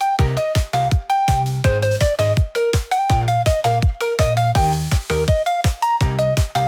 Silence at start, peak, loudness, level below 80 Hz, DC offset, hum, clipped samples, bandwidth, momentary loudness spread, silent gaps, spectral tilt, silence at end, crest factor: 0 s; -6 dBFS; -18 LUFS; -28 dBFS; under 0.1%; none; under 0.1%; 19 kHz; 2 LU; none; -5.5 dB/octave; 0 s; 12 dB